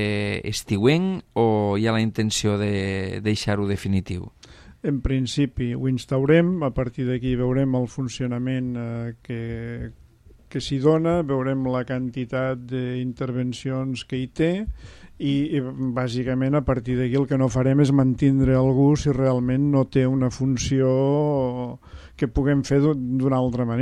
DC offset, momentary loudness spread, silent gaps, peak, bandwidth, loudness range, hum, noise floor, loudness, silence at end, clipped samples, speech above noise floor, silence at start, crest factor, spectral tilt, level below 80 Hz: under 0.1%; 11 LU; none; -4 dBFS; 13 kHz; 6 LU; none; -51 dBFS; -23 LUFS; 0 s; under 0.1%; 29 dB; 0 s; 18 dB; -7 dB/octave; -42 dBFS